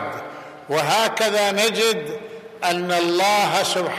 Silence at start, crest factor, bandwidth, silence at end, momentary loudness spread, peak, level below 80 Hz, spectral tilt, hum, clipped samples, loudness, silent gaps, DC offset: 0 s; 16 dB; 15 kHz; 0 s; 16 LU; -6 dBFS; -68 dBFS; -2.5 dB/octave; none; under 0.1%; -19 LUFS; none; under 0.1%